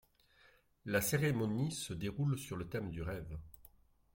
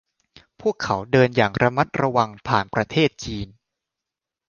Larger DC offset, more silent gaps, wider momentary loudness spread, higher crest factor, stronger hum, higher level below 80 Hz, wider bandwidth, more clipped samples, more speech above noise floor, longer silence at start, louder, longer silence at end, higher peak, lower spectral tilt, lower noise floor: neither; neither; first, 16 LU vs 12 LU; about the same, 18 dB vs 22 dB; neither; second, -58 dBFS vs -50 dBFS; first, 16.5 kHz vs 7.2 kHz; neither; second, 31 dB vs 66 dB; first, 0.85 s vs 0.6 s; second, -38 LUFS vs -21 LUFS; second, 0.5 s vs 1.05 s; second, -20 dBFS vs -2 dBFS; about the same, -5.5 dB/octave vs -6 dB/octave; second, -68 dBFS vs -86 dBFS